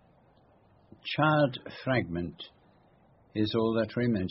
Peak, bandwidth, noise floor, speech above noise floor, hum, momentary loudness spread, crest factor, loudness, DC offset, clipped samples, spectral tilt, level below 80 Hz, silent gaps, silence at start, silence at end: -10 dBFS; 5.8 kHz; -62 dBFS; 34 dB; none; 15 LU; 20 dB; -29 LUFS; under 0.1%; under 0.1%; -5 dB/octave; -60 dBFS; none; 1.05 s; 0 s